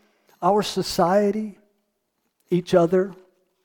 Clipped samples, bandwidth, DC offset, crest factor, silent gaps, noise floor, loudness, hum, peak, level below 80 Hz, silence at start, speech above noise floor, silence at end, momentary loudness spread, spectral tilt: under 0.1%; 19 kHz; under 0.1%; 18 dB; none; -74 dBFS; -22 LUFS; none; -6 dBFS; -56 dBFS; 0.4 s; 54 dB; 0.5 s; 10 LU; -6 dB/octave